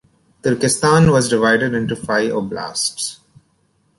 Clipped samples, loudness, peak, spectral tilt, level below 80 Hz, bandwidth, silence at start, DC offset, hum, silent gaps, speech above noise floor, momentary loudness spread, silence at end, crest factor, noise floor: under 0.1%; -17 LUFS; -2 dBFS; -4.5 dB/octave; -46 dBFS; 11.5 kHz; 0.45 s; under 0.1%; none; none; 45 dB; 11 LU; 0.85 s; 16 dB; -62 dBFS